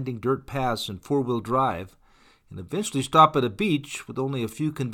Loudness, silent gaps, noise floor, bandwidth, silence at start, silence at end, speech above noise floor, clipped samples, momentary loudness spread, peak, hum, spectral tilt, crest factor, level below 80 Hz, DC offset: -25 LUFS; none; -54 dBFS; 18 kHz; 0 s; 0 s; 29 dB; under 0.1%; 15 LU; -4 dBFS; none; -5.5 dB/octave; 22 dB; -56 dBFS; under 0.1%